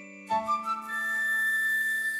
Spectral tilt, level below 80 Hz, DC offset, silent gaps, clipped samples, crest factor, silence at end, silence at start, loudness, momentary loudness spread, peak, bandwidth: -1.5 dB/octave; -70 dBFS; under 0.1%; none; under 0.1%; 10 dB; 0 s; 0 s; -27 LUFS; 7 LU; -18 dBFS; 17 kHz